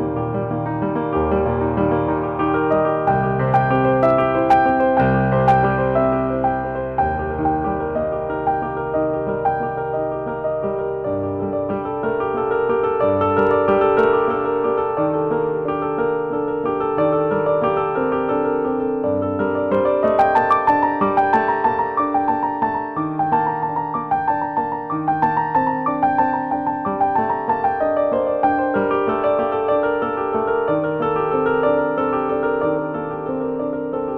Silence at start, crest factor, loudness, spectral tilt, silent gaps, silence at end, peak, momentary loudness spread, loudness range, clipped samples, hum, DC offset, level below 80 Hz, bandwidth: 0 s; 14 dB; -19 LUFS; -9.5 dB/octave; none; 0 s; -6 dBFS; 7 LU; 5 LU; under 0.1%; none; under 0.1%; -42 dBFS; 5.8 kHz